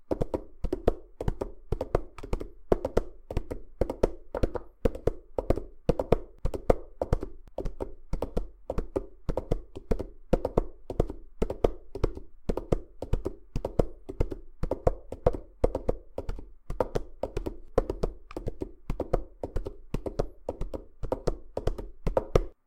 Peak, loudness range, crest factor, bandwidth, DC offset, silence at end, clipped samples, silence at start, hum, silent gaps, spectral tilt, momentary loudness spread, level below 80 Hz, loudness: -4 dBFS; 4 LU; 28 dB; 10.5 kHz; under 0.1%; 0.15 s; under 0.1%; 0 s; none; none; -8 dB/octave; 10 LU; -36 dBFS; -34 LUFS